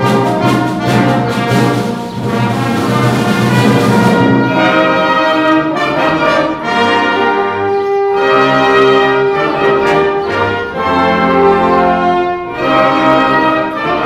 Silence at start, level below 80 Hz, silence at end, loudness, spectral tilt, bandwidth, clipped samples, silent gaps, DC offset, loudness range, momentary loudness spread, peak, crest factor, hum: 0 s; -42 dBFS; 0 s; -11 LUFS; -6 dB/octave; 15.5 kHz; under 0.1%; none; under 0.1%; 2 LU; 5 LU; 0 dBFS; 10 dB; none